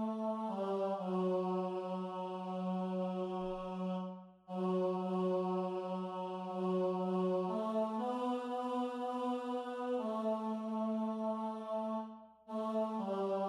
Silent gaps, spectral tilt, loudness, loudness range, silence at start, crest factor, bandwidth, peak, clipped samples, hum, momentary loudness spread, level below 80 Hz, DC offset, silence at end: none; -8.5 dB/octave; -38 LUFS; 2 LU; 0 s; 12 dB; 10 kHz; -26 dBFS; under 0.1%; none; 6 LU; -72 dBFS; under 0.1%; 0 s